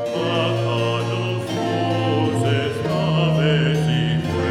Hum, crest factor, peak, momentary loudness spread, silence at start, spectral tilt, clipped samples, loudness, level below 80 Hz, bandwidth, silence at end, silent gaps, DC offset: none; 14 dB; -6 dBFS; 5 LU; 0 s; -6.5 dB/octave; under 0.1%; -20 LUFS; -46 dBFS; 12.5 kHz; 0 s; none; under 0.1%